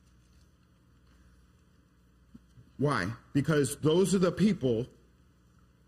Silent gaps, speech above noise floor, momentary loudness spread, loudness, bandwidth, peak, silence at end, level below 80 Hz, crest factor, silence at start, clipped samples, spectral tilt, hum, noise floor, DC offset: none; 36 dB; 7 LU; -29 LUFS; 14.5 kHz; -14 dBFS; 1 s; -60 dBFS; 18 dB; 2.8 s; under 0.1%; -6 dB/octave; 60 Hz at -55 dBFS; -63 dBFS; under 0.1%